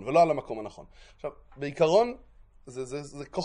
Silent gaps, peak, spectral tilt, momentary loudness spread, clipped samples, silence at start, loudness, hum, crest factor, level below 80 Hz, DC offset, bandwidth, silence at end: none; -10 dBFS; -5.5 dB/octave; 19 LU; under 0.1%; 0 s; -27 LUFS; none; 18 dB; -58 dBFS; under 0.1%; 10.5 kHz; 0 s